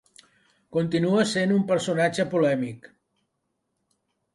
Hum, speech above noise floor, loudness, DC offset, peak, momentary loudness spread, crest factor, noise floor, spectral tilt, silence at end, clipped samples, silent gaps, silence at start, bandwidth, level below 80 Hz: none; 54 dB; -24 LUFS; under 0.1%; -8 dBFS; 8 LU; 18 dB; -78 dBFS; -5.5 dB/octave; 1.6 s; under 0.1%; none; 0.7 s; 11.5 kHz; -68 dBFS